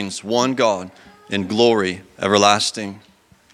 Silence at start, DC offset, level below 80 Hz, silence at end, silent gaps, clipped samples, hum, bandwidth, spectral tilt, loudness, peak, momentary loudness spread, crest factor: 0 s; under 0.1%; -64 dBFS; 0.55 s; none; under 0.1%; none; 14.5 kHz; -3.5 dB/octave; -18 LUFS; 0 dBFS; 13 LU; 20 dB